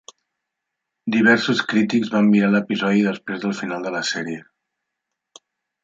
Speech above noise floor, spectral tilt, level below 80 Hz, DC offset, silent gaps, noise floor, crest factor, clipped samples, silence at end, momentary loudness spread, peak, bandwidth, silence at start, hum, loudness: 62 dB; -5.5 dB/octave; -68 dBFS; under 0.1%; none; -81 dBFS; 18 dB; under 0.1%; 1.45 s; 11 LU; -2 dBFS; 7.8 kHz; 1.05 s; none; -19 LUFS